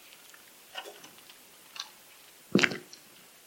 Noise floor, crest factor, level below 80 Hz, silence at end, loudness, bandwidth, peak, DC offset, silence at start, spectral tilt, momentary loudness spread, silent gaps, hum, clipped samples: -55 dBFS; 32 dB; -78 dBFS; 0.65 s; -32 LUFS; 17 kHz; -6 dBFS; under 0.1%; 0.75 s; -4 dB/octave; 25 LU; none; none; under 0.1%